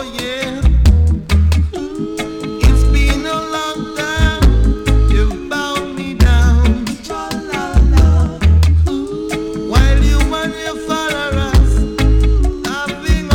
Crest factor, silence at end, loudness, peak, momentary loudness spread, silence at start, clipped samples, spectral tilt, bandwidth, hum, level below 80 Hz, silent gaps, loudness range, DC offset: 10 dB; 0 s; -15 LUFS; -2 dBFS; 10 LU; 0 s; under 0.1%; -6 dB/octave; 14.5 kHz; none; -14 dBFS; none; 2 LU; under 0.1%